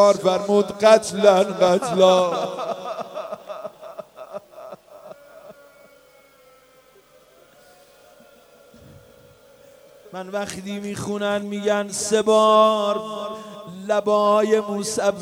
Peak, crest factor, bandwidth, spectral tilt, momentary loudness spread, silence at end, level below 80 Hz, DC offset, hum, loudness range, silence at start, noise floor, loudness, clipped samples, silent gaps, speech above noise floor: 0 dBFS; 20 dB; 16 kHz; -4 dB/octave; 22 LU; 0 s; -64 dBFS; under 0.1%; none; 21 LU; 0 s; -53 dBFS; -20 LUFS; under 0.1%; none; 35 dB